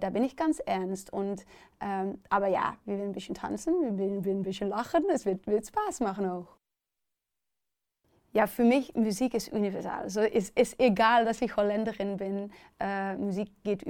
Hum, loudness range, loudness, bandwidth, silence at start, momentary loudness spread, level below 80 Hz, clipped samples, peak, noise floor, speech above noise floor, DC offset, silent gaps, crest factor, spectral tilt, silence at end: none; 5 LU; -30 LUFS; 18.5 kHz; 0 s; 10 LU; -62 dBFS; under 0.1%; -12 dBFS; -88 dBFS; 58 dB; under 0.1%; none; 18 dB; -5.5 dB/octave; 0 s